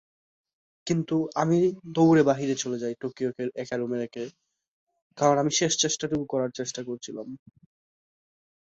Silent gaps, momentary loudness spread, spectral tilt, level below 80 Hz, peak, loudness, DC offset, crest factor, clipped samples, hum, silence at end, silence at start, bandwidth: 4.68-4.87 s, 5.02-5.10 s; 16 LU; -4.5 dB/octave; -66 dBFS; -8 dBFS; -26 LUFS; under 0.1%; 20 dB; under 0.1%; none; 1.3 s; 0.85 s; 8 kHz